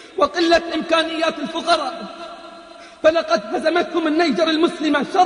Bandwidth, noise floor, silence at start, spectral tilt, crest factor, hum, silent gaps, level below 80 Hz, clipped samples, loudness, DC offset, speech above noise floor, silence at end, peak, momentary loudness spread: 10 kHz; -40 dBFS; 0 s; -3.5 dB/octave; 16 dB; none; none; -54 dBFS; under 0.1%; -19 LUFS; under 0.1%; 22 dB; 0 s; -2 dBFS; 17 LU